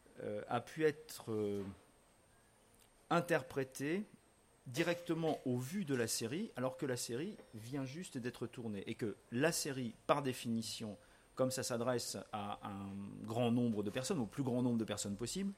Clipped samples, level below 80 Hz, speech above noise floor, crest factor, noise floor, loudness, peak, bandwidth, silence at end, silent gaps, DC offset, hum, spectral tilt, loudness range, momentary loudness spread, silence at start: under 0.1%; -72 dBFS; 30 dB; 24 dB; -69 dBFS; -40 LUFS; -16 dBFS; 16 kHz; 0 s; none; under 0.1%; none; -5 dB/octave; 3 LU; 10 LU; 0.15 s